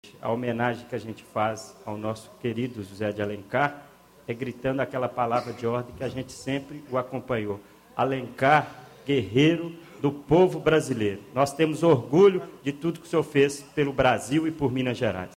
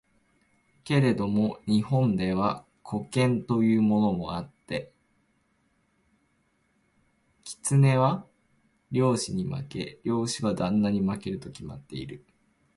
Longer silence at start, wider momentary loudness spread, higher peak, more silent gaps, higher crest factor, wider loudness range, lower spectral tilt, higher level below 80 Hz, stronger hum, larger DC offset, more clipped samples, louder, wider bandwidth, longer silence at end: second, 0.05 s vs 0.85 s; second, 13 LU vs 16 LU; about the same, -6 dBFS vs -8 dBFS; neither; about the same, 20 dB vs 20 dB; about the same, 8 LU vs 7 LU; about the same, -6 dB/octave vs -6.5 dB/octave; about the same, -56 dBFS vs -56 dBFS; neither; neither; neither; about the same, -26 LUFS vs -27 LUFS; first, 16 kHz vs 11.5 kHz; second, 0.05 s vs 0.6 s